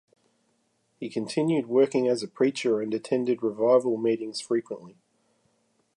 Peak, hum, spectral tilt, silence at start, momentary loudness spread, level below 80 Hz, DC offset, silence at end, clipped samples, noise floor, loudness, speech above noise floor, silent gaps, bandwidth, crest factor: -10 dBFS; none; -5.5 dB/octave; 1 s; 11 LU; -78 dBFS; under 0.1%; 1.05 s; under 0.1%; -71 dBFS; -26 LUFS; 46 dB; none; 11.5 kHz; 18 dB